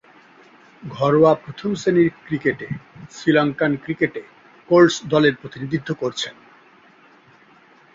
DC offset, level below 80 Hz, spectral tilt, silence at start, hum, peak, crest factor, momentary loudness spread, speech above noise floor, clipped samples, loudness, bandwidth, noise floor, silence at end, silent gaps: under 0.1%; -58 dBFS; -6 dB/octave; 0.85 s; none; -2 dBFS; 18 dB; 17 LU; 32 dB; under 0.1%; -19 LUFS; 7.6 kHz; -51 dBFS; 1.65 s; none